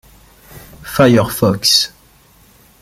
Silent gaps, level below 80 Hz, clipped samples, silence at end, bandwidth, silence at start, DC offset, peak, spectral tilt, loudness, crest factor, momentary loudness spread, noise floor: none; -44 dBFS; under 0.1%; 0.95 s; 16.5 kHz; 0.55 s; under 0.1%; 0 dBFS; -4 dB/octave; -13 LUFS; 16 dB; 12 LU; -48 dBFS